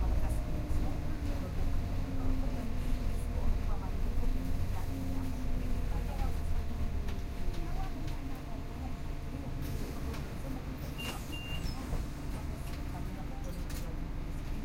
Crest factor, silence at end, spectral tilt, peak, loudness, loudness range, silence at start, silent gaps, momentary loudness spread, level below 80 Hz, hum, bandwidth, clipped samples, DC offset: 14 dB; 0 s; -6.5 dB/octave; -18 dBFS; -39 LUFS; 3 LU; 0 s; none; 5 LU; -34 dBFS; none; 16 kHz; under 0.1%; under 0.1%